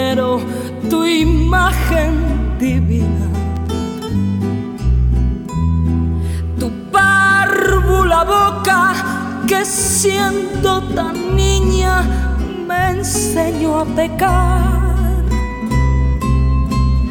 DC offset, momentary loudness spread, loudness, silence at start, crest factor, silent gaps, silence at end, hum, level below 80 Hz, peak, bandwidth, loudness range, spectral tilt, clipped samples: under 0.1%; 7 LU; -15 LUFS; 0 s; 12 dB; none; 0 s; none; -20 dBFS; -2 dBFS; 19 kHz; 5 LU; -5 dB/octave; under 0.1%